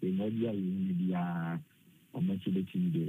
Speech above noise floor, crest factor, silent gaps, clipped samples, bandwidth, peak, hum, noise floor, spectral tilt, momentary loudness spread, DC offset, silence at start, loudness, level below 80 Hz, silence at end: 19 dB; 12 dB; none; under 0.1%; 3.9 kHz; -22 dBFS; none; -52 dBFS; -9.5 dB/octave; 6 LU; under 0.1%; 0 s; -34 LUFS; -76 dBFS; 0 s